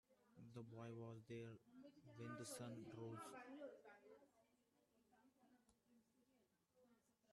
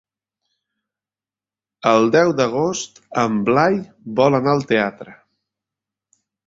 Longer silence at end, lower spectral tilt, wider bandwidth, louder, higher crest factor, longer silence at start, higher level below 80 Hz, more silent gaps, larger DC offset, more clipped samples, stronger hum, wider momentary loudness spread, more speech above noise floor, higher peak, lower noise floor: second, 0 s vs 1.35 s; about the same, -5.5 dB/octave vs -5.5 dB/octave; first, 12 kHz vs 7.8 kHz; second, -58 LUFS vs -18 LUFS; about the same, 18 dB vs 18 dB; second, 0.1 s vs 1.85 s; second, under -90 dBFS vs -60 dBFS; neither; neither; neither; neither; first, 13 LU vs 10 LU; second, 27 dB vs over 73 dB; second, -42 dBFS vs -2 dBFS; second, -84 dBFS vs under -90 dBFS